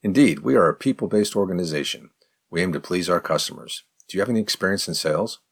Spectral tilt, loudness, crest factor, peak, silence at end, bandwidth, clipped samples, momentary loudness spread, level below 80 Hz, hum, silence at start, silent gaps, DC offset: -4.5 dB/octave; -22 LUFS; 18 dB; -4 dBFS; 0.15 s; 18.5 kHz; under 0.1%; 12 LU; -62 dBFS; none; 0.05 s; none; under 0.1%